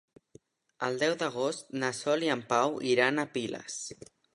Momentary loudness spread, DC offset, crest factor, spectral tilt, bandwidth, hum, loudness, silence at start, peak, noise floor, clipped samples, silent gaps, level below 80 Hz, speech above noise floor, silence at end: 12 LU; under 0.1%; 22 dB; -3.5 dB/octave; 11.5 kHz; none; -30 LUFS; 0.8 s; -8 dBFS; -60 dBFS; under 0.1%; none; -76 dBFS; 30 dB; 0.4 s